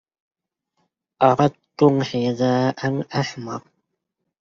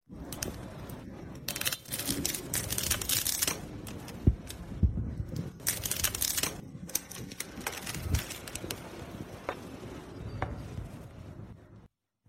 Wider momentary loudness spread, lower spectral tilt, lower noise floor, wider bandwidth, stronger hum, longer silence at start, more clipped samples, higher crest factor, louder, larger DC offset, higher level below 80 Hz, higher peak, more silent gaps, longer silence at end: second, 12 LU vs 16 LU; first, -6 dB/octave vs -3 dB/octave; first, -78 dBFS vs -60 dBFS; second, 7.4 kHz vs 16.5 kHz; neither; first, 1.2 s vs 0.1 s; neither; second, 20 dB vs 28 dB; first, -20 LUFS vs -34 LUFS; neither; second, -62 dBFS vs -44 dBFS; first, -2 dBFS vs -6 dBFS; neither; first, 0.8 s vs 0.4 s